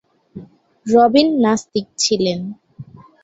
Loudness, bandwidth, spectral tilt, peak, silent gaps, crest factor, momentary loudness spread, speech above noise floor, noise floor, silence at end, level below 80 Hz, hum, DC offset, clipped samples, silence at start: -16 LUFS; 8 kHz; -4 dB/octave; 0 dBFS; none; 18 dB; 19 LU; 24 dB; -39 dBFS; 0.4 s; -56 dBFS; none; under 0.1%; under 0.1%; 0.35 s